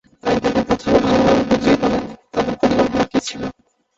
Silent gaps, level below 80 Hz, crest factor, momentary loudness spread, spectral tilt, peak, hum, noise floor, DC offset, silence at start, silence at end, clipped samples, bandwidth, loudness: none; -40 dBFS; 16 dB; 10 LU; -5.5 dB/octave; -2 dBFS; none; -38 dBFS; under 0.1%; 0.25 s; 0.45 s; under 0.1%; 8 kHz; -17 LUFS